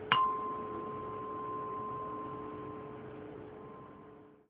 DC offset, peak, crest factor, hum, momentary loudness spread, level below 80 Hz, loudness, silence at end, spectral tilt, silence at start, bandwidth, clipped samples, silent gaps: under 0.1%; -8 dBFS; 30 dB; none; 17 LU; -68 dBFS; -39 LUFS; 0.1 s; -2 dB/octave; 0 s; 4.9 kHz; under 0.1%; none